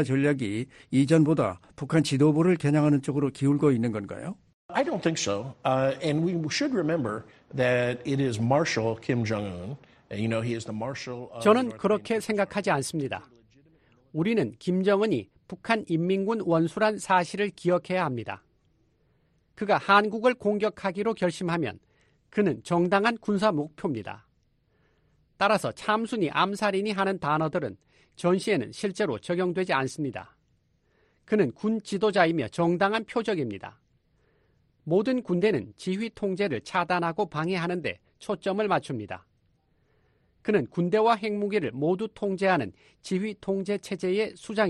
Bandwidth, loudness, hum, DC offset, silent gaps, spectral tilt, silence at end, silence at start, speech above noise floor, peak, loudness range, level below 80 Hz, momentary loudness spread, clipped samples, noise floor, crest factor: 11.5 kHz; -27 LUFS; none; under 0.1%; 4.54-4.69 s; -6 dB/octave; 0 s; 0 s; 42 dB; -6 dBFS; 4 LU; -64 dBFS; 12 LU; under 0.1%; -69 dBFS; 20 dB